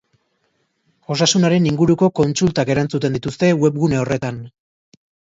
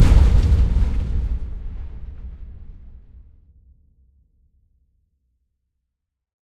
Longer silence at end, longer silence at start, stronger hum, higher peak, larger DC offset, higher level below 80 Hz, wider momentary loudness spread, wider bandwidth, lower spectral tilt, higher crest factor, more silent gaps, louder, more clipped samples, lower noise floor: second, 0.85 s vs 3.5 s; first, 1.1 s vs 0 s; neither; about the same, -2 dBFS vs -2 dBFS; neither; second, -50 dBFS vs -22 dBFS; second, 8 LU vs 25 LU; second, 7.8 kHz vs 8.8 kHz; second, -5.5 dB/octave vs -7.5 dB/octave; about the same, 16 dB vs 20 dB; neither; first, -17 LUFS vs -20 LUFS; neither; second, -67 dBFS vs -80 dBFS